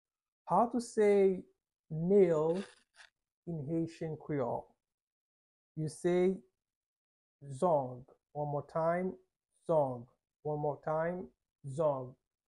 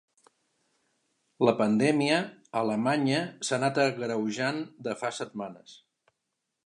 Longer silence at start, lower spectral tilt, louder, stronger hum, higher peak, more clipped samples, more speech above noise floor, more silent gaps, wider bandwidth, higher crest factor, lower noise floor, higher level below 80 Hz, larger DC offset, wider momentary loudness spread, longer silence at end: second, 0.45 s vs 1.4 s; first, -7.5 dB/octave vs -5 dB/octave; second, -34 LUFS vs -28 LUFS; neither; second, -18 dBFS vs -8 dBFS; neither; second, 31 dB vs 55 dB; first, 1.79-1.84 s, 3.34-3.43 s, 4.94-5.75 s, 6.76-7.39 s vs none; about the same, 11.5 kHz vs 11 kHz; about the same, 18 dB vs 22 dB; second, -64 dBFS vs -83 dBFS; first, -70 dBFS vs -78 dBFS; neither; first, 20 LU vs 11 LU; second, 0.4 s vs 0.9 s